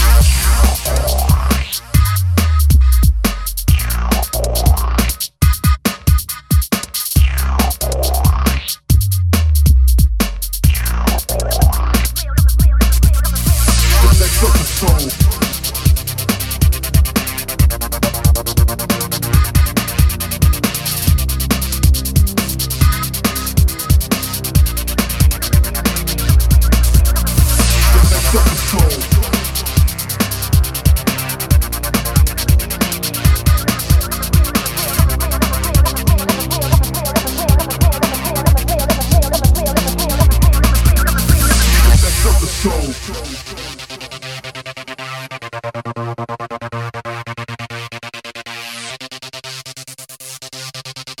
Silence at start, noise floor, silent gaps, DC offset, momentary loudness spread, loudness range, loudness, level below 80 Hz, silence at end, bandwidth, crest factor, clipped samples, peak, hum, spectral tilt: 0 s; -34 dBFS; none; under 0.1%; 14 LU; 13 LU; -14 LUFS; -16 dBFS; 0.05 s; 17.5 kHz; 14 dB; under 0.1%; 0 dBFS; none; -4.5 dB/octave